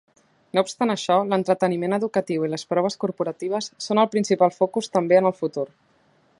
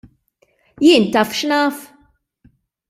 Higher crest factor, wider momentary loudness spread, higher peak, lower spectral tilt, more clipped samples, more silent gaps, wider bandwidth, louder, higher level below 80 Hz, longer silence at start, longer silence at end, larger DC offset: about the same, 18 dB vs 18 dB; about the same, 9 LU vs 9 LU; second, -4 dBFS vs 0 dBFS; first, -5.5 dB/octave vs -4 dB/octave; neither; neither; second, 11.5 kHz vs 16 kHz; second, -23 LUFS vs -15 LUFS; second, -72 dBFS vs -60 dBFS; second, 0.55 s vs 0.8 s; second, 0.7 s vs 1.05 s; neither